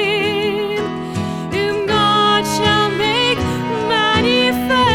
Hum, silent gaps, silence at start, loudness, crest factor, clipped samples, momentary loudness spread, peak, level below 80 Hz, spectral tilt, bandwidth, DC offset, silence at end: none; none; 0 s; -16 LUFS; 14 dB; under 0.1%; 8 LU; -2 dBFS; -42 dBFS; -4.5 dB/octave; 18 kHz; under 0.1%; 0 s